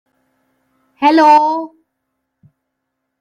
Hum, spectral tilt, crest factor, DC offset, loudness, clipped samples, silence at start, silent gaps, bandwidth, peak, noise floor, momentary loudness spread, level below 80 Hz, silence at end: none; -3.5 dB/octave; 16 dB; under 0.1%; -11 LUFS; under 0.1%; 1 s; none; 11 kHz; 0 dBFS; -74 dBFS; 15 LU; -68 dBFS; 1.55 s